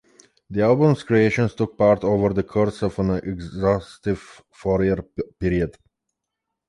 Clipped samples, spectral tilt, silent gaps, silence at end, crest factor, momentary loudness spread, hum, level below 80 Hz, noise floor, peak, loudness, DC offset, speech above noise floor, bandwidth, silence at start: under 0.1%; -8 dB/octave; none; 1 s; 16 dB; 11 LU; none; -42 dBFS; -82 dBFS; -4 dBFS; -22 LUFS; under 0.1%; 61 dB; 11.5 kHz; 0.5 s